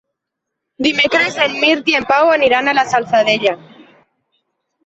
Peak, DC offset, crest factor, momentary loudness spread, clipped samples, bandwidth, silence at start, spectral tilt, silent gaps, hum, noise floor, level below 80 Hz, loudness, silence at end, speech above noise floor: -2 dBFS; under 0.1%; 14 dB; 5 LU; under 0.1%; 8.2 kHz; 0.8 s; -3 dB/octave; none; none; -78 dBFS; -58 dBFS; -13 LUFS; 1.3 s; 65 dB